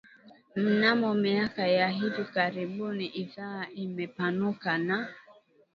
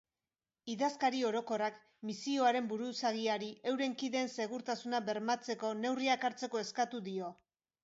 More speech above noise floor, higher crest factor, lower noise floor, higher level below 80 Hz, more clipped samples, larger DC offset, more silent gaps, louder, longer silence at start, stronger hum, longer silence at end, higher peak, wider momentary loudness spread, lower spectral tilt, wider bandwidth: second, 30 dB vs over 54 dB; about the same, 20 dB vs 18 dB; second, -59 dBFS vs under -90 dBFS; first, -72 dBFS vs -86 dBFS; neither; neither; neither; first, -29 LUFS vs -36 LUFS; second, 0.25 s vs 0.65 s; neither; about the same, 0.45 s vs 0.5 s; first, -8 dBFS vs -18 dBFS; first, 13 LU vs 9 LU; first, -7.5 dB/octave vs -2.5 dB/octave; second, 6.4 kHz vs 7.6 kHz